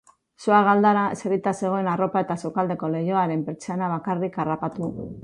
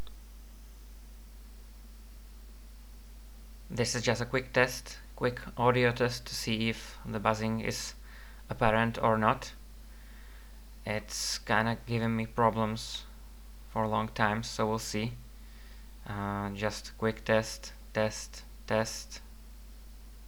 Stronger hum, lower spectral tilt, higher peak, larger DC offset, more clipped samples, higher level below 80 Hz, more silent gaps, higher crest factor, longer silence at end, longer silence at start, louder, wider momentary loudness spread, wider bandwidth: neither; first, -7 dB/octave vs -4.5 dB/octave; first, -6 dBFS vs -10 dBFS; neither; neither; second, -60 dBFS vs -48 dBFS; neither; second, 18 dB vs 24 dB; about the same, 0 s vs 0 s; first, 0.4 s vs 0 s; first, -23 LUFS vs -31 LUFS; second, 11 LU vs 24 LU; second, 11 kHz vs over 20 kHz